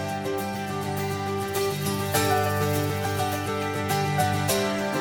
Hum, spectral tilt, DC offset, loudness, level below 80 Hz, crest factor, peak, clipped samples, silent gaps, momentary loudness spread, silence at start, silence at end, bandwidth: none; -4.5 dB/octave; under 0.1%; -26 LUFS; -56 dBFS; 16 dB; -10 dBFS; under 0.1%; none; 6 LU; 0 s; 0 s; 19.5 kHz